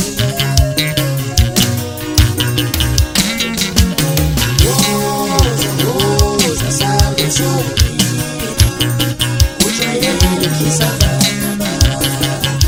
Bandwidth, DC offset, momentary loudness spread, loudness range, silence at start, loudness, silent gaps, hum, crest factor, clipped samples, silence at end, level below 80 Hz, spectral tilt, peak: over 20 kHz; under 0.1%; 3 LU; 1 LU; 0 s; -13 LUFS; none; none; 14 dB; under 0.1%; 0 s; -22 dBFS; -4 dB/octave; 0 dBFS